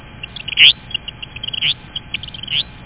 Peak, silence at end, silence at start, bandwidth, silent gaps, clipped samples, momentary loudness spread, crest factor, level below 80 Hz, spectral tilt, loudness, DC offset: 0 dBFS; 0 s; 0.05 s; 4 kHz; none; under 0.1%; 19 LU; 18 dB; -44 dBFS; 1.5 dB/octave; -14 LUFS; 0.3%